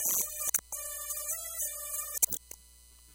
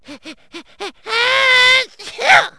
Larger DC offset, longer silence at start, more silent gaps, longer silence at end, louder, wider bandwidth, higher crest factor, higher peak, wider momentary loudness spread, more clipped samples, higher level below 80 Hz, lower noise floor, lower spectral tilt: second, under 0.1% vs 0.3%; about the same, 0 s vs 0.1 s; neither; about the same, 0 s vs 0.1 s; second, -32 LUFS vs -12 LUFS; first, 17.5 kHz vs 11 kHz; first, 28 dB vs 16 dB; second, -8 dBFS vs 0 dBFS; second, 9 LU vs 21 LU; second, under 0.1% vs 0.1%; about the same, -60 dBFS vs -58 dBFS; first, -57 dBFS vs -37 dBFS; about the same, 0.5 dB/octave vs 0 dB/octave